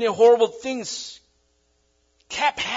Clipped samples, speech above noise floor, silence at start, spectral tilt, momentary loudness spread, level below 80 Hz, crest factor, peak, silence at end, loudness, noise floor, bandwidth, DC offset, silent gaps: under 0.1%; 45 dB; 0 s; -2.5 dB/octave; 16 LU; -64 dBFS; 18 dB; -4 dBFS; 0 s; -21 LUFS; -66 dBFS; 7.8 kHz; under 0.1%; none